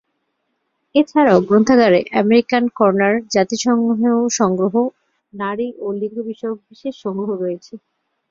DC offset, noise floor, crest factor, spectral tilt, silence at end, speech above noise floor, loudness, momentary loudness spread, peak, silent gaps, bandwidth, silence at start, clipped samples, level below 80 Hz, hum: under 0.1%; -71 dBFS; 16 dB; -5 dB/octave; 0.55 s; 55 dB; -17 LUFS; 13 LU; -2 dBFS; none; 7.6 kHz; 0.95 s; under 0.1%; -58 dBFS; none